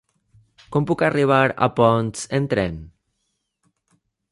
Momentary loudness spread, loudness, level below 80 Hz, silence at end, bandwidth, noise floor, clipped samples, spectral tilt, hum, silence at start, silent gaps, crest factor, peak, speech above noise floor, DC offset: 8 LU; -20 LUFS; -50 dBFS; 1.45 s; 11.5 kHz; -74 dBFS; under 0.1%; -6 dB/octave; none; 0.7 s; none; 20 dB; -2 dBFS; 55 dB; under 0.1%